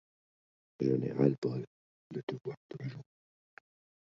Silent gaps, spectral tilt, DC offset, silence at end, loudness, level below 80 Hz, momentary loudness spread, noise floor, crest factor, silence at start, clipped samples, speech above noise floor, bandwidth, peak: 1.38-1.42 s, 1.67-2.10 s, 2.23-2.27 s, 2.57-2.69 s; -9.5 dB/octave; under 0.1%; 1.1 s; -35 LUFS; -76 dBFS; 15 LU; under -90 dBFS; 24 dB; 0.8 s; under 0.1%; over 56 dB; 7.4 kHz; -14 dBFS